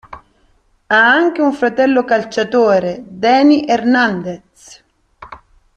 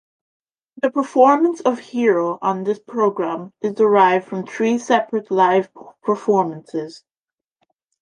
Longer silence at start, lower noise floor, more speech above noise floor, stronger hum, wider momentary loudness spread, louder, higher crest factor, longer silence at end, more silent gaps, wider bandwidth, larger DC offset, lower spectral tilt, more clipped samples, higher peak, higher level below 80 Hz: second, 0.1 s vs 0.85 s; second, -55 dBFS vs -89 dBFS; second, 43 dB vs 71 dB; neither; second, 10 LU vs 14 LU; first, -13 LUFS vs -19 LUFS; about the same, 14 dB vs 18 dB; second, 0.4 s vs 1.05 s; neither; second, 8.8 kHz vs 10 kHz; neither; about the same, -5 dB/octave vs -6 dB/octave; neither; about the same, 0 dBFS vs 0 dBFS; first, -54 dBFS vs -72 dBFS